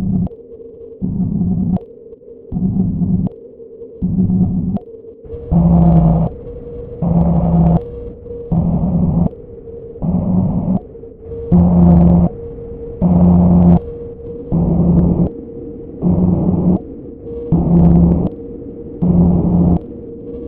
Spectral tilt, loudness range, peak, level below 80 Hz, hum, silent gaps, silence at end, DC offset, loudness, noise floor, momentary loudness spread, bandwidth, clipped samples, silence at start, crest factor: -14.5 dB/octave; 6 LU; 0 dBFS; -26 dBFS; none; none; 0 s; under 0.1%; -14 LUFS; -36 dBFS; 20 LU; 1.5 kHz; under 0.1%; 0 s; 14 dB